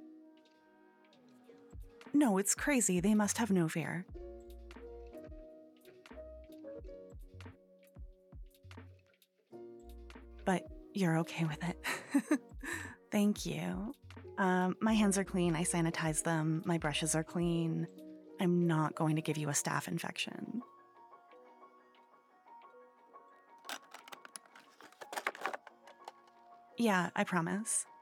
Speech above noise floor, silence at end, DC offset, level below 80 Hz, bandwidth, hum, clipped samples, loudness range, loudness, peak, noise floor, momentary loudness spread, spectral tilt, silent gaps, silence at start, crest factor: 38 dB; 0.05 s; under 0.1%; -58 dBFS; 17.5 kHz; none; under 0.1%; 20 LU; -35 LUFS; -18 dBFS; -71 dBFS; 23 LU; -4.5 dB/octave; none; 0 s; 20 dB